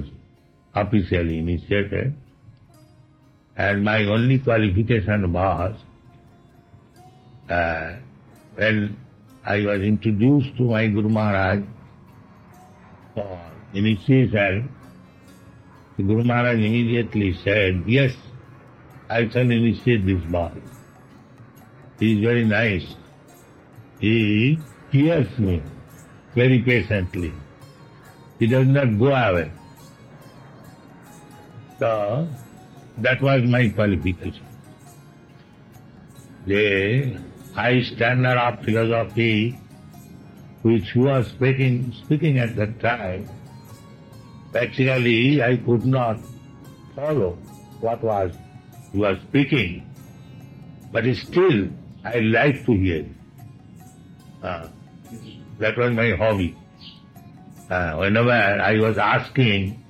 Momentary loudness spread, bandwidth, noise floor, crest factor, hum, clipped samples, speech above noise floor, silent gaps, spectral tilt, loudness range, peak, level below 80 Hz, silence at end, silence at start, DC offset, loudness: 20 LU; 12 kHz; -55 dBFS; 18 dB; none; under 0.1%; 35 dB; none; -8 dB/octave; 5 LU; -4 dBFS; -48 dBFS; 0.1 s; 0 s; under 0.1%; -21 LUFS